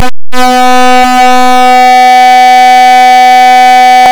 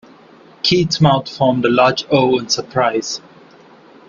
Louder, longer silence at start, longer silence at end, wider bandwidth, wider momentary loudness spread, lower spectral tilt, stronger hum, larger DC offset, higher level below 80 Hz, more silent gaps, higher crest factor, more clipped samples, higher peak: first, -2 LUFS vs -15 LUFS; second, 0 s vs 0.65 s; second, 0 s vs 0.9 s; first, over 20 kHz vs 7.4 kHz; second, 3 LU vs 7 LU; second, -2 dB/octave vs -5 dB/octave; neither; neither; first, -38 dBFS vs -52 dBFS; neither; second, 2 dB vs 16 dB; first, 50% vs under 0.1%; about the same, 0 dBFS vs 0 dBFS